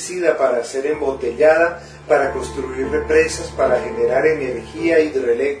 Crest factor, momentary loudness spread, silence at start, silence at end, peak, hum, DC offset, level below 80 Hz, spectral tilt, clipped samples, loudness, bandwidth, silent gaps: 16 dB; 7 LU; 0 s; 0 s; 0 dBFS; none; under 0.1%; -40 dBFS; -4.5 dB/octave; under 0.1%; -18 LUFS; 11 kHz; none